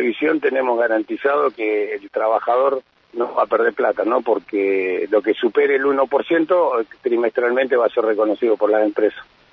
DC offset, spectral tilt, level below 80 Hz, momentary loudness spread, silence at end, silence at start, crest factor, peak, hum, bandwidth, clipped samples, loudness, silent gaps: under 0.1%; -7 dB/octave; -68 dBFS; 5 LU; 0.3 s; 0 s; 14 dB; -4 dBFS; none; 5.4 kHz; under 0.1%; -19 LUFS; none